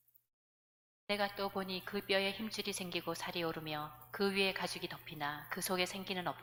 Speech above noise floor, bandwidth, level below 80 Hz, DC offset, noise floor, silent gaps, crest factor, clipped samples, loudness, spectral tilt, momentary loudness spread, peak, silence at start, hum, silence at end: over 51 dB; 19 kHz; -70 dBFS; under 0.1%; under -90 dBFS; none; 22 dB; under 0.1%; -38 LUFS; -3.5 dB/octave; 8 LU; -16 dBFS; 1.1 s; none; 0 s